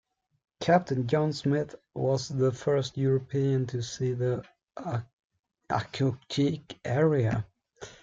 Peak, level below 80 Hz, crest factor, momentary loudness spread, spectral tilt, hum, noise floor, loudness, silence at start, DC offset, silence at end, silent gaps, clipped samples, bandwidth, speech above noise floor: -10 dBFS; -60 dBFS; 20 dB; 11 LU; -6.5 dB/octave; none; -49 dBFS; -29 LUFS; 0.6 s; under 0.1%; 0.1 s; 5.13-5.30 s; under 0.1%; 7.8 kHz; 21 dB